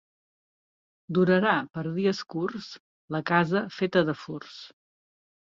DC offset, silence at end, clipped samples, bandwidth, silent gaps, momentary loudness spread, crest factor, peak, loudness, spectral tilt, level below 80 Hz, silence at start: under 0.1%; 0.9 s; under 0.1%; 7.4 kHz; 2.80-3.08 s; 18 LU; 20 dB; -10 dBFS; -26 LUFS; -7 dB/octave; -68 dBFS; 1.1 s